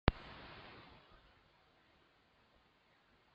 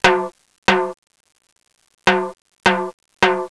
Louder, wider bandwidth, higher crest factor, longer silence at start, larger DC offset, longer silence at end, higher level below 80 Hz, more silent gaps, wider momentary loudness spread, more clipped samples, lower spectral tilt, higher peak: second, -47 LUFS vs -19 LUFS; second, 5.8 kHz vs 11 kHz; first, 36 dB vs 14 dB; about the same, 0.05 s vs 0.05 s; second, under 0.1% vs 0.3%; first, 2.35 s vs 0.05 s; about the same, -50 dBFS vs -48 dBFS; second, none vs 0.58-0.62 s, 0.98-1.02 s, 1.52-1.56 s, 2.94-2.98 s; first, 19 LU vs 12 LU; neither; about the same, -4.5 dB/octave vs -4 dB/octave; second, -10 dBFS vs -6 dBFS